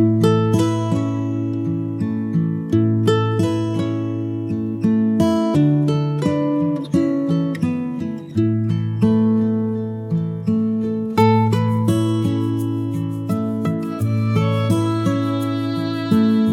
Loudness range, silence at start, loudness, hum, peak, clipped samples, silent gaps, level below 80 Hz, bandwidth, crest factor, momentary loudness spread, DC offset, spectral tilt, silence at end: 2 LU; 0 s; -19 LUFS; none; -2 dBFS; under 0.1%; none; -54 dBFS; 13 kHz; 16 dB; 7 LU; under 0.1%; -8 dB/octave; 0 s